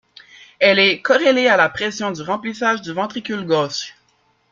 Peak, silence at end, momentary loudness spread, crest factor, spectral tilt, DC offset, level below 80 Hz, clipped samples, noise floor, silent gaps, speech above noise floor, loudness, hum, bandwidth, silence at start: -2 dBFS; 0.6 s; 11 LU; 18 dB; -3.5 dB/octave; under 0.1%; -62 dBFS; under 0.1%; -61 dBFS; none; 44 dB; -17 LUFS; none; 7.6 kHz; 0.4 s